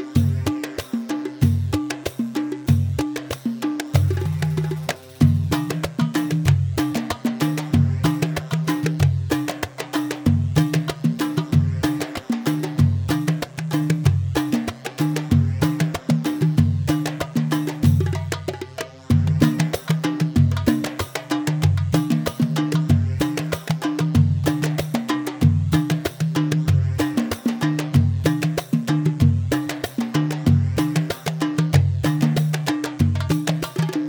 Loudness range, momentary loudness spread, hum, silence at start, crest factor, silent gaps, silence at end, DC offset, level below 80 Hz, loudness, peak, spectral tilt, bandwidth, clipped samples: 2 LU; 7 LU; none; 0 s; 18 dB; none; 0 s; under 0.1%; -42 dBFS; -21 LUFS; -2 dBFS; -6.5 dB/octave; over 20 kHz; under 0.1%